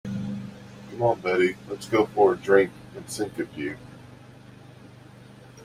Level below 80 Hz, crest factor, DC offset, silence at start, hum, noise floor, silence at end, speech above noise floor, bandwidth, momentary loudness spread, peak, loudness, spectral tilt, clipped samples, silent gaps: -60 dBFS; 22 dB; under 0.1%; 0.05 s; 50 Hz at -55 dBFS; -48 dBFS; 0 s; 24 dB; 15 kHz; 21 LU; -4 dBFS; -25 LUFS; -5.5 dB/octave; under 0.1%; none